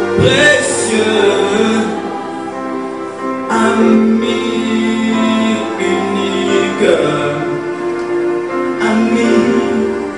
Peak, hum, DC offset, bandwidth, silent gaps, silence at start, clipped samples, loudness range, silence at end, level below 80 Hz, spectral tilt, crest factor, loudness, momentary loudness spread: 0 dBFS; none; 0.3%; 11 kHz; none; 0 s; under 0.1%; 2 LU; 0 s; -48 dBFS; -4.5 dB/octave; 14 dB; -14 LUFS; 11 LU